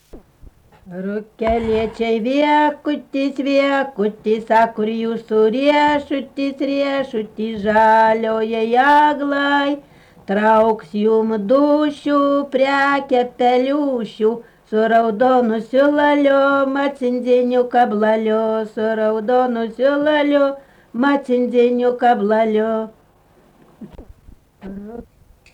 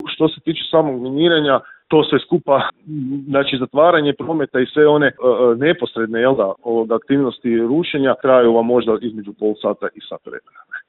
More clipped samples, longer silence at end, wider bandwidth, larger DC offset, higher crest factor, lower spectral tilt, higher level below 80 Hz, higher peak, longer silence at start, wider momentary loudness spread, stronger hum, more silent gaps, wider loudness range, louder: neither; first, 0.5 s vs 0.1 s; first, 9.6 kHz vs 4.2 kHz; neither; about the same, 12 dB vs 16 dB; second, -6.5 dB/octave vs -11 dB/octave; first, -50 dBFS vs -58 dBFS; second, -4 dBFS vs 0 dBFS; first, 0.15 s vs 0 s; about the same, 10 LU vs 12 LU; neither; neither; about the same, 3 LU vs 2 LU; about the same, -17 LUFS vs -16 LUFS